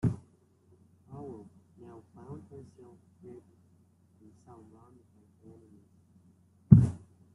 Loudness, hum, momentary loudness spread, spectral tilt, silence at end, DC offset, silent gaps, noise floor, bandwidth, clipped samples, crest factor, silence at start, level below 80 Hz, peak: -23 LUFS; none; 31 LU; -11 dB/octave; 0.45 s; under 0.1%; none; -64 dBFS; 10 kHz; under 0.1%; 30 dB; 0.05 s; -52 dBFS; -2 dBFS